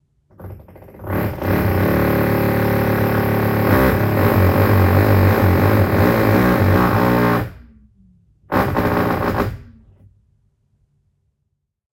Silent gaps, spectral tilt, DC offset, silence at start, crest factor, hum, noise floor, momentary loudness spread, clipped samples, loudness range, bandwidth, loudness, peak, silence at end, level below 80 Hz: none; -8 dB/octave; under 0.1%; 0.4 s; 16 dB; none; -72 dBFS; 9 LU; under 0.1%; 8 LU; 16.5 kHz; -16 LUFS; -2 dBFS; 2.35 s; -34 dBFS